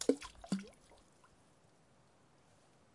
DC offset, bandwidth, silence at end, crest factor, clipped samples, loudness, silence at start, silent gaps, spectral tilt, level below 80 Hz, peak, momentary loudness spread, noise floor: under 0.1%; 11.5 kHz; 2.25 s; 30 dB; under 0.1%; -42 LUFS; 0 s; none; -5 dB/octave; -70 dBFS; -14 dBFS; 26 LU; -69 dBFS